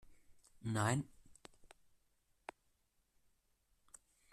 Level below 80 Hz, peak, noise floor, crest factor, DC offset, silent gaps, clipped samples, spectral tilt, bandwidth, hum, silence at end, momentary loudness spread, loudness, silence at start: -72 dBFS; -22 dBFS; -79 dBFS; 24 dB; under 0.1%; none; under 0.1%; -5 dB/octave; 13.5 kHz; none; 2.65 s; 26 LU; -40 LUFS; 0.1 s